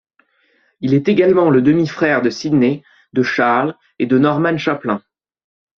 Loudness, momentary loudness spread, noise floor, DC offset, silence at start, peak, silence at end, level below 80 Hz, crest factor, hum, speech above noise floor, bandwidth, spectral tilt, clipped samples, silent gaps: -16 LUFS; 11 LU; -59 dBFS; under 0.1%; 0.8 s; 0 dBFS; 0.8 s; -56 dBFS; 16 dB; none; 45 dB; 7 kHz; -7 dB/octave; under 0.1%; none